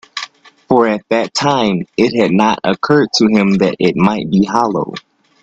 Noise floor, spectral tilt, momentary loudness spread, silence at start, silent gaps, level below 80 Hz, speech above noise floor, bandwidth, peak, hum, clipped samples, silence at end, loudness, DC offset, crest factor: -33 dBFS; -5.5 dB/octave; 10 LU; 0.15 s; none; -50 dBFS; 20 dB; 8 kHz; 0 dBFS; none; under 0.1%; 0.45 s; -13 LUFS; under 0.1%; 14 dB